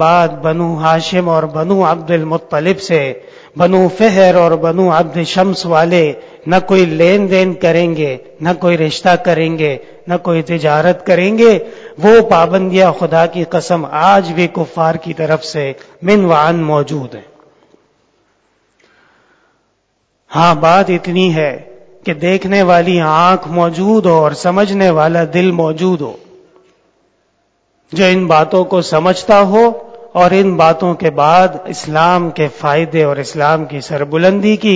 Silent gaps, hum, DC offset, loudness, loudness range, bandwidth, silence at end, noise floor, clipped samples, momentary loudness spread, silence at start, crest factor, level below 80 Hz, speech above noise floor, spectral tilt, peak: none; none; under 0.1%; -11 LUFS; 5 LU; 8 kHz; 0 s; -62 dBFS; 0.4%; 9 LU; 0 s; 12 dB; -50 dBFS; 51 dB; -6.5 dB/octave; 0 dBFS